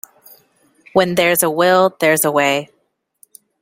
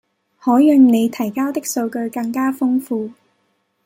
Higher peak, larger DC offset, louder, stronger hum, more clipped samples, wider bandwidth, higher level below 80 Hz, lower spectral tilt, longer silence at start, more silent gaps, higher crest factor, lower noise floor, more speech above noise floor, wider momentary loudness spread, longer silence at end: about the same, 0 dBFS vs -2 dBFS; neither; about the same, -15 LUFS vs -17 LUFS; neither; neither; about the same, 16.5 kHz vs 16 kHz; first, -60 dBFS vs -68 dBFS; second, -3.5 dB/octave vs -5 dB/octave; first, 0.95 s vs 0.45 s; neither; about the same, 18 dB vs 14 dB; about the same, -66 dBFS vs -66 dBFS; about the same, 51 dB vs 50 dB; second, 5 LU vs 13 LU; first, 0.95 s vs 0.75 s